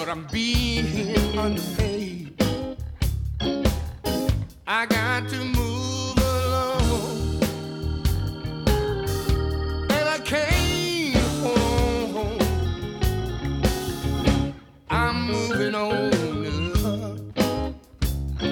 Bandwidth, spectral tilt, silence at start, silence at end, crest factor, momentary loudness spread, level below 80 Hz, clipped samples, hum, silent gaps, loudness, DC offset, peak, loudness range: 17.5 kHz; -5 dB/octave; 0 s; 0 s; 16 dB; 7 LU; -30 dBFS; under 0.1%; none; none; -25 LUFS; under 0.1%; -8 dBFS; 3 LU